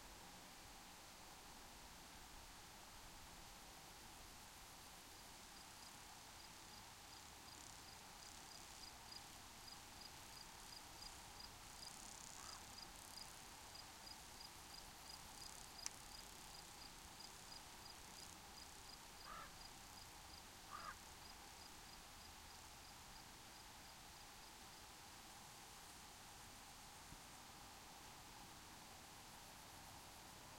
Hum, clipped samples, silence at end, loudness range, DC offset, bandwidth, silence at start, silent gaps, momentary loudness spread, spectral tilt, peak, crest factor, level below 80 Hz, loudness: none; under 0.1%; 0 s; 3 LU; under 0.1%; 16.5 kHz; 0 s; none; 4 LU; -1.5 dB/octave; -24 dBFS; 34 dB; -70 dBFS; -57 LUFS